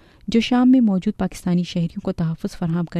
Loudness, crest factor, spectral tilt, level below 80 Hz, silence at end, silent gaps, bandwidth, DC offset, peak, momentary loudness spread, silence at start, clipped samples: -20 LUFS; 14 dB; -7 dB/octave; -44 dBFS; 0 s; none; 12.5 kHz; under 0.1%; -6 dBFS; 10 LU; 0.3 s; under 0.1%